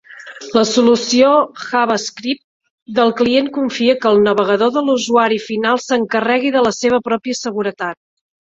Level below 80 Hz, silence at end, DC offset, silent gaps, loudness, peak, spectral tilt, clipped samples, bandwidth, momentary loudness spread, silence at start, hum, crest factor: -56 dBFS; 0.5 s; under 0.1%; 2.44-2.60 s, 2.70-2.86 s; -15 LUFS; 0 dBFS; -3.5 dB/octave; under 0.1%; 7.8 kHz; 9 LU; 0.1 s; none; 14 dB